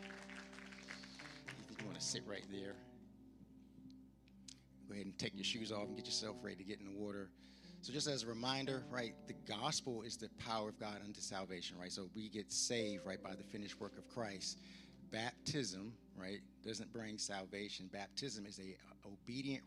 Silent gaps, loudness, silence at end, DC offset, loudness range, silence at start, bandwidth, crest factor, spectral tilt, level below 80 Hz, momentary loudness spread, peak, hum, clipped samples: none; -46 LUFS; 0 s; under 0.1%; 6 LU; 0 s; 15 kHz; 22 dB; -3 dB/octave; -74 dBFS; 18 LU; -26 dBFS; none; under 0.1%